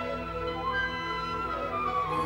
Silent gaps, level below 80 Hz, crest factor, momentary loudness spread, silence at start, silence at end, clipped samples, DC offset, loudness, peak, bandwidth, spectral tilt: none; -48 dBFS; 12 dB; 4 LU; 0 s; 0 s; under 0.1%; under 0.1%; -31 LUFS; -18 dBFS; 17 kHz; -5.5 dB/octave